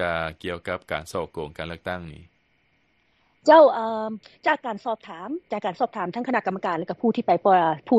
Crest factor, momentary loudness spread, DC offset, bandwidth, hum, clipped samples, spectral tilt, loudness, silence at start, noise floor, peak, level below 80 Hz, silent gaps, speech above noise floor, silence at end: 20 dB; 17 LU; under 0.1%; 12.5 kHz; none; under 0.1%; -6 dB/octave; -24 LUFS; 0 s; -67 dBFS; -4 dBFS; -56 dBFS; none; 44 dB; 0 s